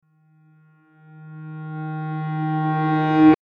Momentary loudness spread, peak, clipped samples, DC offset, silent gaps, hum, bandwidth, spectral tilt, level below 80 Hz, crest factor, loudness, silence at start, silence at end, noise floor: 22 LU; -4 dBFS; under 0.1%; under 0.1%; none; none; 5.2 kHz; -10 dB/octave; -58 dBFS; 18 dB; -22 LUFS; 1.15 s; 0.1 s; -57 dBFS